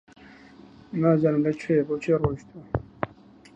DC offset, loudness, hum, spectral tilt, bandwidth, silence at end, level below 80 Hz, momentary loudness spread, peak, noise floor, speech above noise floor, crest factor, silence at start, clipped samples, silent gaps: under 0.1%; -25 LUFS; none; -9 dB/octave; 8.6 kHz; 0.5 s; -48 dBFS; 14 LU; -6 dBFS; -51 dBFS; 27 dB; 20 dB; 0.9 s; under 0.1%; none